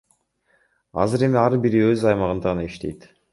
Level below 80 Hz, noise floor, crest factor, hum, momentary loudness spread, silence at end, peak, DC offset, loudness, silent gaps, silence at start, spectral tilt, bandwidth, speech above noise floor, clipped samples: -46 dBFS; -65 dBFS; 18 dB; none; 14 LU; 0.35 s; -4 dBFS; under 0.1%; -20 LUFS; none; 0.95 s; -7.5 dB/octave; 11.5 kHz; 45 dB; under 0.1%